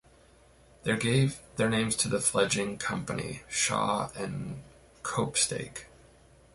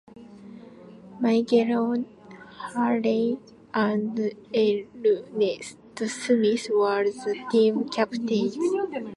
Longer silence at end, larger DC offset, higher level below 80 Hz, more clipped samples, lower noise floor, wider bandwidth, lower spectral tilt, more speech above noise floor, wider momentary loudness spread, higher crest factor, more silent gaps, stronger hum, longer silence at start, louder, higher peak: first, 0.7 s vs 0 s; neither; first, -58 dBFS vs -70 dBFS; neither; first, -59 dBFS vs -46 dBFS; about the same, 12 kHz vs 11.5 kHz; second, -3.5 dB/octave vs -5.5 dB/octave; first, 29 dB vs 22 dB; about the same, 12 LU vs 14 LU; about the same, 20 dB vs 18 dB; neither; neither; first, 0.85 s vs 0.15 s; second, -29 LUFS vs -25 LUFS; second, -12 dBFS vs -8 dBFS